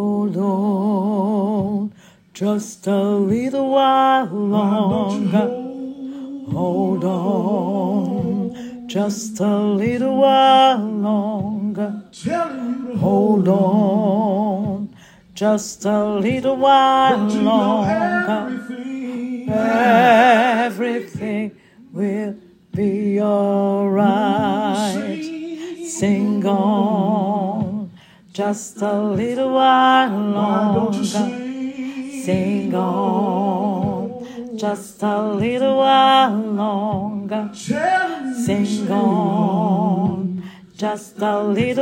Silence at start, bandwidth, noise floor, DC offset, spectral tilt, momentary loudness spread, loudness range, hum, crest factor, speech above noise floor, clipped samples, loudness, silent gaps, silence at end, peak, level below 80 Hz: 0 s; 15.5 kHz; -45 dBFS; under 0.1%; -6 dB/octave; 13 LU; 4 LU; none; 16 dB; 27 dB; under 0.1%; -18 LUFS; none; 0 s; -2 dBFS; -60 dBFS